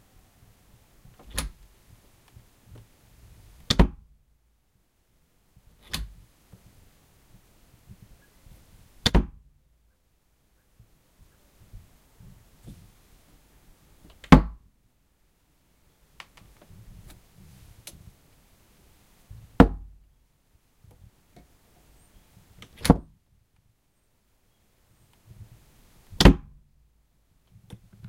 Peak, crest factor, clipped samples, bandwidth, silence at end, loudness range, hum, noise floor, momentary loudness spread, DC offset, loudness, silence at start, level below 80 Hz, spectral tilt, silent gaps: 0 dBFS; 30 dB; under 0.1%; 16 kHz; 1.7 s; 17 LU; none; -69 dBFS; 32 LU; under 0.1%; -23 LUFS; 1.35 s; -36 dBFS; -5.5 dB/octave; none